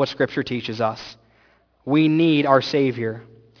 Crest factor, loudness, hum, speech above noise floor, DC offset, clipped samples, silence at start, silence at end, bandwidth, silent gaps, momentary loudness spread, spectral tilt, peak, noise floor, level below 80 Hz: 20 dB; -20 LUFS; none; 39 dB; under 0.1%; under 0.1%; 0 s; 0.4 s; 5.4 kHz; none; 19 LU; -7 dB/octave; -2 dBFS; -59 dBFS; -62 dBFS